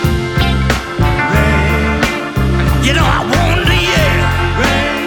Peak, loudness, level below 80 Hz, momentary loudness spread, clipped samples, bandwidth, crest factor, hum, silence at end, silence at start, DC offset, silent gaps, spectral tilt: 0 dBFS; -13 LUFS; -18 dBFS; 4 LU; under 0.1%; 19.5 kHz; 12 dB; none; 0 s; 0 s; under 0.1%; none; -5 dB/octave